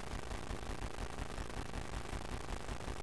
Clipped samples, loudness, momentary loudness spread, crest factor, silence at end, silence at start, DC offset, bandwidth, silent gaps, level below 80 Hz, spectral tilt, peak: under 0.1%; -45 LUFS; 0 LU; 16 dB; 0 s; 0 s; 0.3%; 11 kHz; none; -46 dBFS; -4.5 dB/octave; -26 dBFS